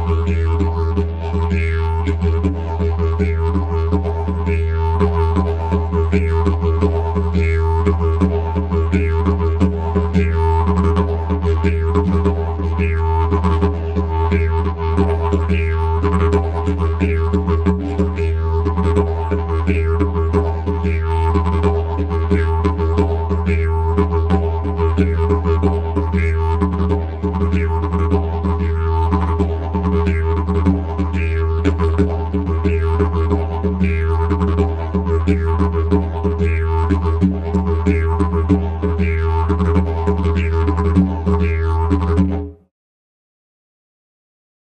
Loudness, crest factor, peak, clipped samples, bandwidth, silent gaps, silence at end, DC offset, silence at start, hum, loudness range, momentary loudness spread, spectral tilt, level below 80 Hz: -18 LUFS; 14 dB; -2 dBFS; under 0.1%; 5 kHz; none; 2.1 s; under 0.1%; 0 s; none; 1 LU; 3 LU; -9 dB/octave; -22 dBFS